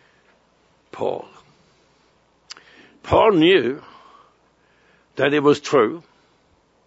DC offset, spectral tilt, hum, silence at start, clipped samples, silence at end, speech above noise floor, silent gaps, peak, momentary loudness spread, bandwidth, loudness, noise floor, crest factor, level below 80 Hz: under 0.1%; -5.5 dB/octave; none; 0.95 s; under 0.1%; 0.9 s; 43 dB; none; -4 dBFS; 26 LU; 8 kHz; -18 LUFS; -60 dBFS; 20 dB; -52 dBFS